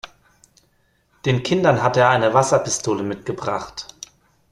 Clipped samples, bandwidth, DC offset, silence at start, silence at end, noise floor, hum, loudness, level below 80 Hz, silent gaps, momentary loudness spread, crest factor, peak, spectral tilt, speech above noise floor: under 0.1%; 12.5 kHz; under 0.1%; 0.05 s; 0.7 s; -63 dBFS; none; -19 LUFS; -54 dBFS; none; 18 LU; 20 dB; -2 dBFS; -4.5 dB/octave; 44 dB